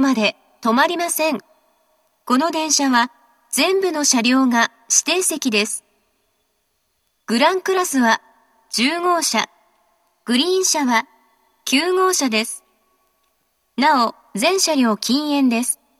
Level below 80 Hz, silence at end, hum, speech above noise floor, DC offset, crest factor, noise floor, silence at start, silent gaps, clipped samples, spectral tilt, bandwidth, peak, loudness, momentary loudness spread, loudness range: -80 dBFS; 0.25 s; none; 51 dB; under 0.1%; 18 dB; -69 dBFS; 0 s; none; under 0.1%; -1.5 dB/octave; 14.5 kHz; -2 dBFS; -18 LUFS; 9 LU; 3 LU